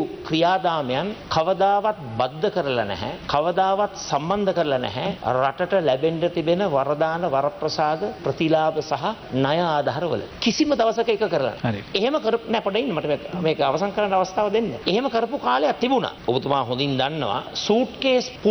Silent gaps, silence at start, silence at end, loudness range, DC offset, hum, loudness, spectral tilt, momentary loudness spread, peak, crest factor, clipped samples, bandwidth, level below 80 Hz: none; 0 s; 0 s; 1 LU; under 0.1%; none; -22 LUFS; -5.5 dB/octave; 6 LU; -4 dBFS; 18 dB; under 0.1%; over 20 kHz; -52 dBFS